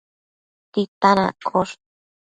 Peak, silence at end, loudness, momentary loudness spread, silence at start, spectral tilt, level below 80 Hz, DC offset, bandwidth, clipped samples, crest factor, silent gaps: 0 dBFS; 0.55 s; -21 LUFS; 11 LU; 0.75 s; -6 dB/octave; -60 dBFS; under 0.1%; 9.4 kHz; under 0.1%; 22 dB; 0.88-1.01 s